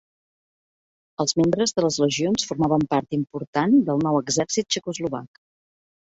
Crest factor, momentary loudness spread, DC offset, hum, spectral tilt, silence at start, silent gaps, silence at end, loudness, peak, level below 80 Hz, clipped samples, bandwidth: 16 dB; 9 LU; under 0.1%; none; -4.5 dB/octave; 1.2 s; 3.47-3.53 s; 0.75 s; -22 LUFS; -6 dBFS; -58 dBFS; under 0.1%; 8 kHz